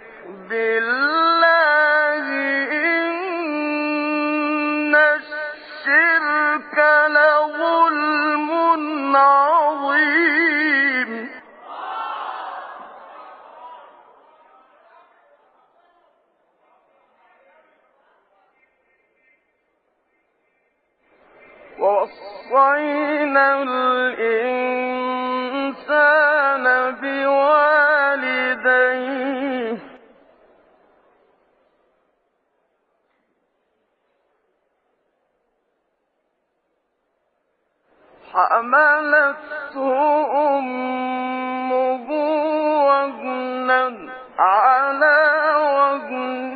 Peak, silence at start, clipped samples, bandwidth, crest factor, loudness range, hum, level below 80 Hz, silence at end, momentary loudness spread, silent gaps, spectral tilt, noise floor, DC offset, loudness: -4 dBFS; 0 s; under 0.1%; 4.9 kHz; 16 dB; 12 LU; none; -72 dBFS; 0 s; 13 LU; none; 0.5 dB/octave; -71 dBFS; under 0.1%; -18 LUFS